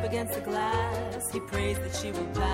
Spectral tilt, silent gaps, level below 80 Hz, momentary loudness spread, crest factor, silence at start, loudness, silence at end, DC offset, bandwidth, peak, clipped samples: -4.5 dB/octave; none; -42 dBFS; 4 LU; 14 dB; 0 s; -31 LUFS; 0 s; under 0.1%; 16.5 kHz; -16 dBFS; under 0.1%